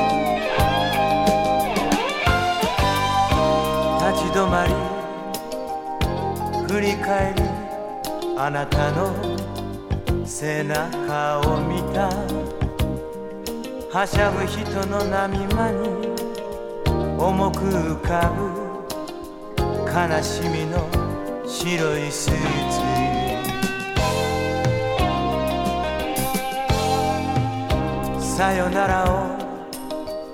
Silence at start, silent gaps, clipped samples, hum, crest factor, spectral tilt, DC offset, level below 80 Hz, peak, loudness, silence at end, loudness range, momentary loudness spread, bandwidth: 0 s; none; under 0.1%; none; 18 dB; -5 dB/octave; under 0.1%; -34 dBFS; -4 dBFS; -22 LUFS; 0 s; 4 LU; 10 LU; 18.5 kHz